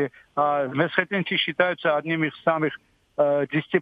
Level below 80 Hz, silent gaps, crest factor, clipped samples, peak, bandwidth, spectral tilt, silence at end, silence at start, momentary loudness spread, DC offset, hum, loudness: -72 dBFS; none; 18 dB; under 0.1%; -6 dBFS; 5 kHz; -8 dB/octave; 0 s; 0 s; 6 LU; under 0.1%; none; -24 LUFS